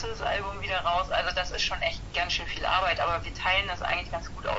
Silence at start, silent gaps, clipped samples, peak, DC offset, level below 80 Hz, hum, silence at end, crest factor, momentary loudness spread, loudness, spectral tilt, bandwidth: 0 s; none; under 0.1%; -10 dBFS; under 0.1%; -42 dBFS; none; 0 s; 18 dB; 5 LU; -28 LUFS; -3 dB/octave; 8 kHz